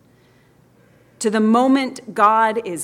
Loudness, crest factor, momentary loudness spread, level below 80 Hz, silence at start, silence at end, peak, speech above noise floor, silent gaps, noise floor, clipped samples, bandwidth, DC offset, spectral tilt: -17 LUFS; 16 dB; 9 LU; -68 dBFS; 1.2 s; 0 s; -2 dBFS; 37 dB; none; -54 dBFS; under 0.1%; 14 kHz; under 0.1%; -4.5 dB/octave